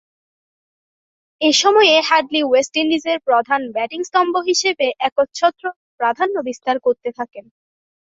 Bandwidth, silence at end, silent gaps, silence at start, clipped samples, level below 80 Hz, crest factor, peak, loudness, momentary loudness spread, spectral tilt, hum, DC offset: 8 kHz; 0.7 s; 5.12-5.16 s, 5.76-5.98 s; 1.4 s; under 0.1%; -66 dBFS; 18 dB; 0 dBFS; -17 LUFS; 12 LU; -1 dB/octave; none; under 0.1%